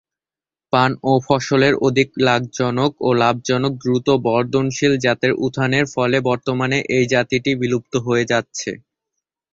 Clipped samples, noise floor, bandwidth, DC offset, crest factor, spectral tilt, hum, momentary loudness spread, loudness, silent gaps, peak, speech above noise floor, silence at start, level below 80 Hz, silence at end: under 0.1%; under -90 dBFS; 7.8 kHz; under 0.1%; 16 dB; -5.5 dB/octave; none; 4 LU; -18 LUFS; none; -2 dBFS; over 72 dB; 0.75 s; -54 dBFS; 0.75 s